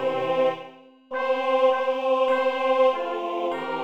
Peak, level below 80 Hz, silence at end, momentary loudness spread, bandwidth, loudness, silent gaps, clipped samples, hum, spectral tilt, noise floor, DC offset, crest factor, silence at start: -10 dBFS; -72 dBFS; 0 s; 7 LU; 7.6 kHz; -23 LUFS; none; under 0.1%; none; -5 dB/octave; -46 dBFS; 0.2%; 14 dB; 0 s